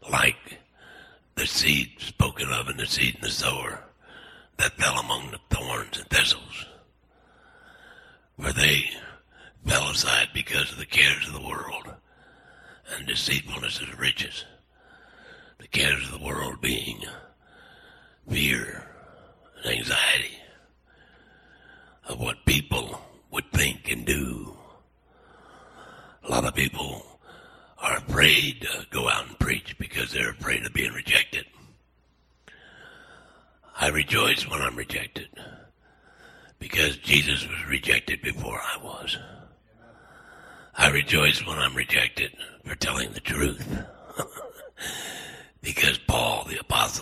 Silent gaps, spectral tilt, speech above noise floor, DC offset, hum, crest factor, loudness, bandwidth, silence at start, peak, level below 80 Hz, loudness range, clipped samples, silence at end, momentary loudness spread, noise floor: none; -2.5 dB/octave; 38 dB; under 0.1%; none; 26 dB; -24 LUFS; 16 kHz; 0.05 s; -2 dBFS; -44 dBFS; 6 LU; under 0.1%; 0 s; 18 LU; -64 dBFS